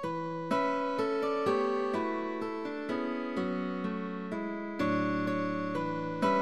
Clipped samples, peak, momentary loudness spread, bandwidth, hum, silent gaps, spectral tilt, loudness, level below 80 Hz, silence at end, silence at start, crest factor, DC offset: under 0.1%; -16 dBFS; 7 LU; 13 kHz; none; none; -7 dB/octave; -33 LUFS; -68 dBFS; 0 s; 0 s; 16 dB; 0.2%